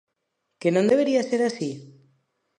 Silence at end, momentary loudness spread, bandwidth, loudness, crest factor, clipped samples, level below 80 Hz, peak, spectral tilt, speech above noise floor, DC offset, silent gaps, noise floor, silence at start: 0.75 s; 12 LU; 10.5 kHz; -23 LUFS; 16 dB; under 0.1%; -72 dBFS; -8 dBFS; -6 dB/octave; 56 dB; under 0.1%; none; -78 dBFS; 0.6 s